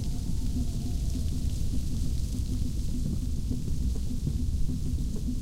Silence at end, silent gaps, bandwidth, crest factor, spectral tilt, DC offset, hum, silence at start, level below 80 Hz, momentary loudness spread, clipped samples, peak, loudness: 0 s; none; 15.5 kHz; 12 dB; -6.5 dB/octave; under 0.1%; none; 0 s; -30 dBFS; 1 LU; under 0.1%; -16 dBFS; -32 LUFS